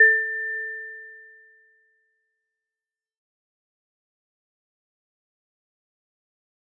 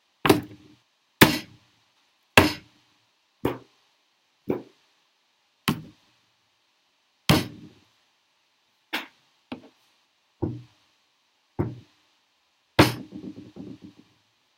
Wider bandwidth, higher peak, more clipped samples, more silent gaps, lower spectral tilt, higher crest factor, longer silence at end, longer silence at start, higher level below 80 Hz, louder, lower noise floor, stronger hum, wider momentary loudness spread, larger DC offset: second, 2.1 kHz vs 16 kHz; second, -6 dBFS vs 0 dBFS; neither; neither; second, 10.5 dB/octave vs -4.5 dB/octave; second, 24 dB vs 30 dB; first, 5.55 s vs 0.9 s; second, 0 s vs 0.25 s; second, under -90 dBFS vs -52 dBFS; about the same, -24 LUFS vs -24 LUFS; first, under -90 dBFS vs -69 dBFS; neither; about the same, 23 LU vs 24 LU; neither